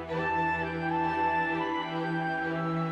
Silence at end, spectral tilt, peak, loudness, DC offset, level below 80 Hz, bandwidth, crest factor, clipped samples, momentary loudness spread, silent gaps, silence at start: 0 s; -7.5 dB/octave; -18 dBFS; -30 LUFS; under 0.1%; -60 dBFS; 8.6 kHz; 12 dB; under 0.1%; 4 LU; none; 0 s